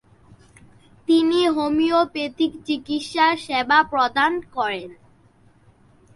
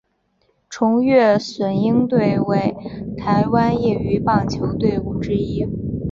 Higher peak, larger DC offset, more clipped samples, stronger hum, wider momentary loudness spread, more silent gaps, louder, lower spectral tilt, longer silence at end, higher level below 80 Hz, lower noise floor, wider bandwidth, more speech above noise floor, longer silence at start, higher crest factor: about the same, -2 dBFS vs -2 dBFS; neither; neither; neither; about the same, 9 LU vs 10 LU; neither; about the same, -20 LUFS vs -18 LUFS; second, -4 dB/octave vs -7.5 dB/octave; first, 1.2 s vs 0 s; second, -58 dBFS vs -40 dBFS; second, -55 dBFS vs -64 dBFS; first, 11.5 kHz vs 7.6 kHz; second, 35 dB vs 47 dB; first, 1.1 s vs 0.7 s; about the same, 20 dB vs 16 dB